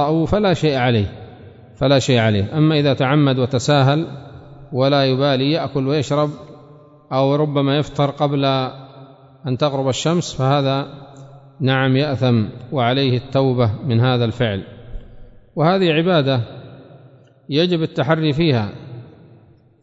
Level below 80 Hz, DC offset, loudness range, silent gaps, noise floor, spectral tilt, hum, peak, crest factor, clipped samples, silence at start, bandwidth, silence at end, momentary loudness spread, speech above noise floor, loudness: -44 dBFS; under 0.1%; 4 LU; none; -49 dBFS; -6.5 dB/octave; none; -2 dBFS; 16 dB; under 0.1%; 0 s; 8 kHz; 0.75 s; 13 LU; 32 dB; -18 LUFS